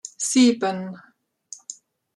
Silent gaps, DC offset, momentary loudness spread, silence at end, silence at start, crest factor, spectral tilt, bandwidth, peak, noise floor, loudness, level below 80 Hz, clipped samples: none; under 0.1%; 21 LU; 0.45 s; 0.05 s; 18 dB; -3.5 dB/octave; 12 kHz; -6 dBFS; -46 dBFS; -20 LUFS; -74 dBFS; under 0.1%